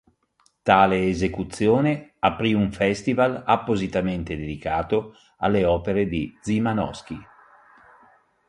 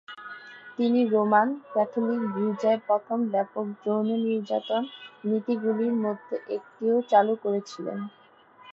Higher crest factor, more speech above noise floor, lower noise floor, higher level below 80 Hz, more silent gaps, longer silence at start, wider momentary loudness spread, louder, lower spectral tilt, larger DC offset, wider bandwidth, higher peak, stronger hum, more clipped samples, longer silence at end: about the same, 22 dB vs 18 dB; first, 43 dB vs 27 dB; first, -65 dBFS vs -53 dBFS; first, -44 dBFS vs -82 dBFS; neither; first, 0.65 s vs 0.1 s; second, 10 LU vs 13 LU; first, -23 LUFS vs -26 LUFS; about the same, -6.5 dB/octave vs -7 dB/octave; neither; first, 11.5 kHz vs 7.2 kHz; first, -2 dBFS vs -8 dBFS; neither; neither; first, 1.25 s vs 0 s